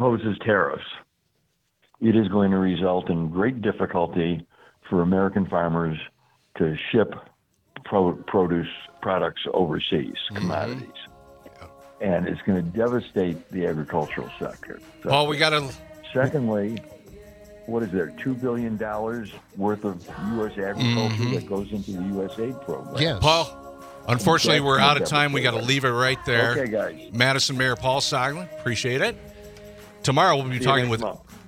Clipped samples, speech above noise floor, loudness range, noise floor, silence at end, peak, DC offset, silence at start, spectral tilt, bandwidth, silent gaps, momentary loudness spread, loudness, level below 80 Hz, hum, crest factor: under 0.1%; 47 dB; 7 LU; -71 dBFS; 0 s; 0 dBFS; under 0.1%; 0 s; -5 dB/octave; 16 kHz; none; 15 LU; -24 LUFS; -54 dBFS; none; 24 dB